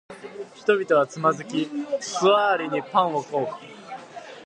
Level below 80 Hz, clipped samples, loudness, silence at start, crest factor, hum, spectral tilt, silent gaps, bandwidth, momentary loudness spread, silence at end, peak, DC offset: -74 dBFS; under 0.1%; -23 LUFS; 0.1 s; 20 dB; none; -4.5 dB/octave; none; 10 kHz; 19 LU; 0 s; -6 dBFS; under 0.1%